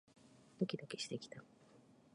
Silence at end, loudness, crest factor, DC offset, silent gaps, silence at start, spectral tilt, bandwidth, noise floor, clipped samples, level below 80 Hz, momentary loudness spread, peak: 0.25 s; -45 LUFS; 24 dB; under 0.1%; none; 0.15 s; -5 dB/octave; 11 kHz; -66 dBFS; under 0.1%; -86 dBFS; 24 LU; -24 dBFS